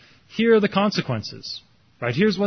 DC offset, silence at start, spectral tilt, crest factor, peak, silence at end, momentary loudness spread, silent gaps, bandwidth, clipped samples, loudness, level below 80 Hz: under 0.1%; 0.35 s; -6 dB/octave; 16 dB; -6 dBFS; 0 s; 16 LU; none; 6.6 kHz; under 0.1%; -22 LUFS; -58 dBFS